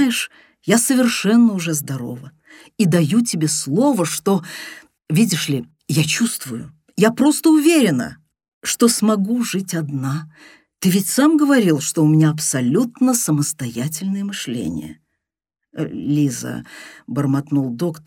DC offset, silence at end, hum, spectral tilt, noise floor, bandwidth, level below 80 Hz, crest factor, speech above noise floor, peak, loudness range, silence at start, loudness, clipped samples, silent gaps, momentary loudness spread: under 0.1%; 0.05 s; none; -5 dB/octave; -83 dBFS; 17.5 kHz; -60 dBFS; 16 dB; 65 dB; -2 dBFS; 7 LU; 0 s; -18 LUFS; under 0.1%; 8.48-8.61 s; 15 LU